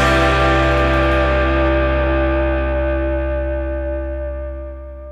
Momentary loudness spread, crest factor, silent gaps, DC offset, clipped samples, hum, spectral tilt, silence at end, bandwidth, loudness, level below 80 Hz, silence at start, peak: 13 LU; 14 dB; none; under 0.1%; under 0.1%; none; -6.5 dB/octave; 0 s; 9.6 kHz; -17 LUFS; -22 dBFS; 0 s; -2 dBFS